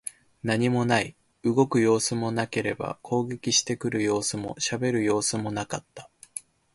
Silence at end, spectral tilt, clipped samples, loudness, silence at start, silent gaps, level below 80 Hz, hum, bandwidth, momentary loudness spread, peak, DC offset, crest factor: 0.35 s; -4 dB/octave; under 0.1%; -26 LUFS; 0.05 s; none; -60 dBFS; none; 11.5 kHz; 13 LU; -6 dBFS; under 0.1%; 20 dB